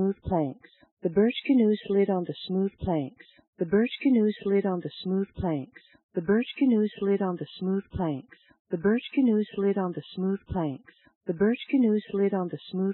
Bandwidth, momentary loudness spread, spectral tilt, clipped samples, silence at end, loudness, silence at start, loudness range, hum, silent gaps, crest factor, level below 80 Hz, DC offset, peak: 4.2 kHz; 10 LU; -6.5 dB/octave; under 0.1%; 0 s; -27 LUFS; 0 s; 2 LU; none; 0.91-0.97 s, 3.47-3.53 s, 6.03-6.09 s, 8.59-8.65 s, 11.15-11.21 s; 16 dB; -56 dBFS; under 0.1%; -12 dBFS